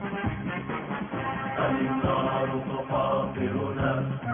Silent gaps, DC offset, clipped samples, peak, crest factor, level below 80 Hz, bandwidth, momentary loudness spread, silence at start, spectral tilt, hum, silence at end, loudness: none; under 0.1%; under 0.1%; -12 dBFS; 16 dB; -48 dBFS; 3.7 kHz; 7 LU; 0 s; -11 dB/octave; none; 0 s; -28 LUFS